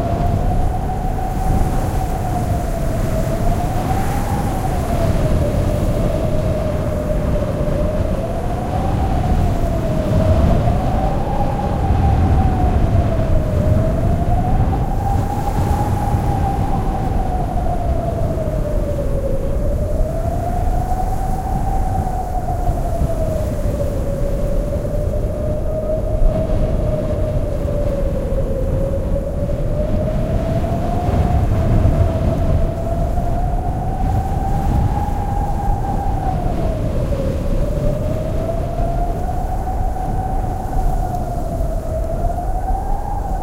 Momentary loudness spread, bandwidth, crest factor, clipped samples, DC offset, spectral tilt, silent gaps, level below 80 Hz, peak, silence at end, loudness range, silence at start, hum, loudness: 5 LU; 16 kHz; 14 dB; under 0.1%; under 0.1%; -8 dB/octave; none; -20 dBFS; -2 dBFS; 0 s; 4 LU; 0 s; none; -20 LUFS